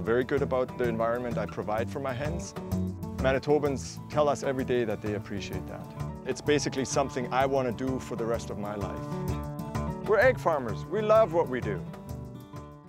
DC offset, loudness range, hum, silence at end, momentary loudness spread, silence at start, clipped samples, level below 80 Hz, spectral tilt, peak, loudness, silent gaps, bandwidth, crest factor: under 0.1%; 3 LU; none; 0 s; 13 LU; 0 s; under 0.1%; -48 dBFS; -6 dB/octave; -10 dBFS; -29 LUFS; none; 16 kHz; 18 dB